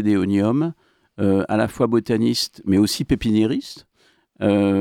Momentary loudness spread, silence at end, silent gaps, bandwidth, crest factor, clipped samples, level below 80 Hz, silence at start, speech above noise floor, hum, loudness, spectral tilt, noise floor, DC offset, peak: 6 LU; 0 s; none; 16.5 kHz; 14 dB; under 0.1%; -46 dBFS; 0 s; 41 dB; none; -20 LUFS; -6 dB/octave; -60 dBFS; under 0.1%; -6 dBFS